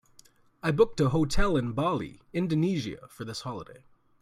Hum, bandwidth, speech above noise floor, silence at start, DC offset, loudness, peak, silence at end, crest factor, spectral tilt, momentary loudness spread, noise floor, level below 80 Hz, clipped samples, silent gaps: none; 14 kHz; 32 dB; 0.65 s; under 0.1%; -29 LUFS; -10 dBFS; 0.45 s; 18 dB; -6.5 dB/octave; 14 LU; -59 dBFS; -40 dBFS; under 0.1%; none